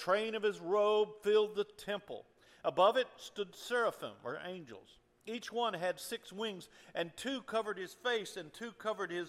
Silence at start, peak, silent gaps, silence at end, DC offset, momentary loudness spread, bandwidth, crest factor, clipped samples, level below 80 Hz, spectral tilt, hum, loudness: 0 s; -16 dBFS; none; 0 s; under 0.1%; 15 LU; 15 kHz; 20 dB; under 0.1%; -78 dBFS; -3.5 dB/octave; none; -36 LUFS